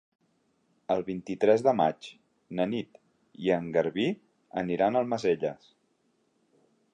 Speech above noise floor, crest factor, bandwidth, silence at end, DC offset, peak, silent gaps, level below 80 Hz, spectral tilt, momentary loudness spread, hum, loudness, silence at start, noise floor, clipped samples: 44 dB; 20 dB; 9.6 kHz; 1.4 s; under 0.1%; -10 dBFS; none; -68 dBFS; -6.5 dB/octave; 18 LU; none; -28 LUFS; 0.9 s; -72 dBFS; under 0.1%